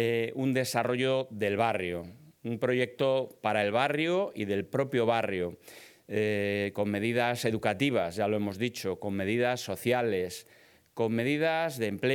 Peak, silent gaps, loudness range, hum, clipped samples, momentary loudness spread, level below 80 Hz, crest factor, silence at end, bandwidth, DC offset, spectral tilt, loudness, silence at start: -10 dBFS; none; 1 LU; none; under 0.1%; 8 LU; -72 dBFS; 18 dB; 0 s; 19 kHz; under 0.1%; -5.5 dB/octave; -30 LUFS; 0 s